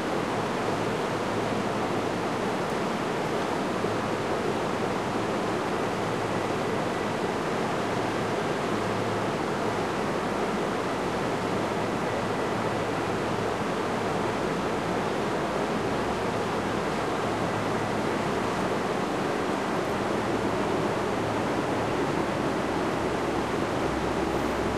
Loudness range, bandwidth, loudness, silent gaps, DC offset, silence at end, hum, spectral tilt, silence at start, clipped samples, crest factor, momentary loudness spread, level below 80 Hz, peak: 1 LU; 13 kHz; -28 LUFS; none; 0.2%; 0 s; none; -5.5 dB/octave; 0 s; under 0.1%; 14 dB; 1 LU; -50 dBFS; -14 dBFS